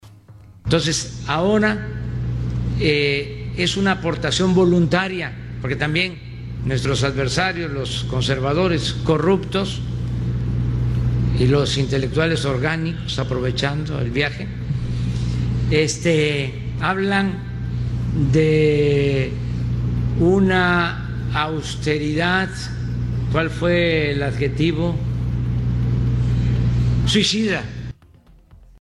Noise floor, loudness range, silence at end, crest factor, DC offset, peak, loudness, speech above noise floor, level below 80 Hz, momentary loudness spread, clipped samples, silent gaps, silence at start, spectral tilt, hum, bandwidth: -49 dBFS; 2 LU; 0.25 s; 16 dB; under 0.1%; -4 dBFS; -20 LUFS; 30 dB; -32 dBFS; 9 LU; under 0.1%; none; 0.05 s; -5.5 dB/octave; none; 11.5 kHz